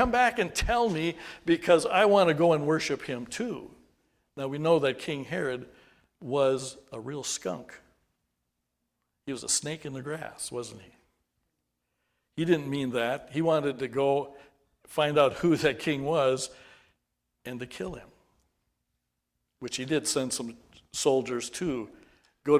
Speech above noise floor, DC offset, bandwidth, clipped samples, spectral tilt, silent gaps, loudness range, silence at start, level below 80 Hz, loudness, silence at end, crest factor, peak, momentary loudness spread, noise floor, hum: 53 dB; under 0.1%; 16 kHz; under 0.1%; -4 dB/octave; none; 9 LU; 0 s; -52 dBFS; -28 LUFS; 0 s; 22 dB; -8 dBFS; 16 LU; -81 dBFS; none